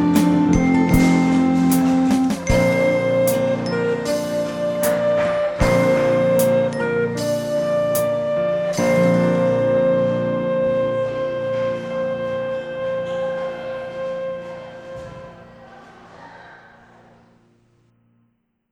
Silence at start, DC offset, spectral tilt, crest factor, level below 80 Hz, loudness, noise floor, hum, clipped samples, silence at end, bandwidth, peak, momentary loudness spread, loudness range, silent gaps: 0 s; under 0.1%; -6.5 dB/octave; 16 dB; -38 dBFS; -19 LUFS; -66 dBFS; none; under 0.1%; 2.15 s; 19 kHz; -2 dBFS; 11 LU; 12 LU; none